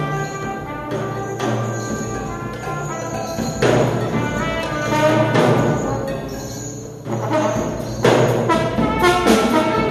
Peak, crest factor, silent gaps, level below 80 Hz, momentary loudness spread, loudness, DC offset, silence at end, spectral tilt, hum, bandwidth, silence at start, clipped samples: 0 dBFS; 18 dB; none; -40 dBFS; 12 LU; -19 LUFS; under 0.1%; 0 s; -5.5 dB/octave; none; 14 kHz; 0 s; under 0.1%